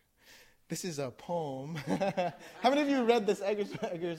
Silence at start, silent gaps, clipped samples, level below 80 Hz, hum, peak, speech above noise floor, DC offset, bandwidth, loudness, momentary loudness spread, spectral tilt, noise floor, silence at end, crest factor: 0.3 s; none; under 0.1%; -70 dBFS; none; -14 dBFS; 28 dB; under 0.1%; 16.5 kHz; -32 LUFS; 11 LU; -5 dB/octave; -60 dBFS; 0 s; 20 dB